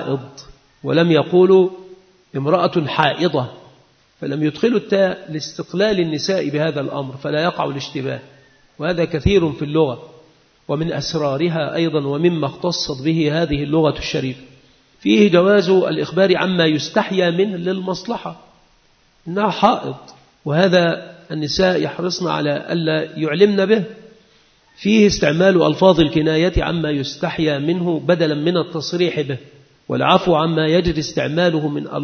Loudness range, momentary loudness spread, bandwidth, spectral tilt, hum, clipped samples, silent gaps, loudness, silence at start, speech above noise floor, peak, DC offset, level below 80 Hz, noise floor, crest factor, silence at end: 5 LU; 12 LU; 6.6 kHz; -6 dB/octave; none; under 0.1%; none; -18 LUFS; 0 s; 39 dB; 0 dBFS; under 0.1%; -42 dBFS; -56 dBFS; 18 dB; 0 s